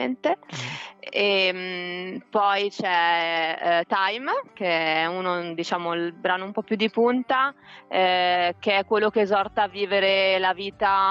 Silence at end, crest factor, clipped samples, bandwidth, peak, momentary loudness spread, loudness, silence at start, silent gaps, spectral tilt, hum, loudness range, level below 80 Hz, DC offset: 0 s; 14 dB; under 0.1%; 8 kHz; -10 dBFS; 9 LU; -23 LUFS; 0 s; none; -4.5 dB/octave; none; 3 LU; -66 dBFS; under 0.1%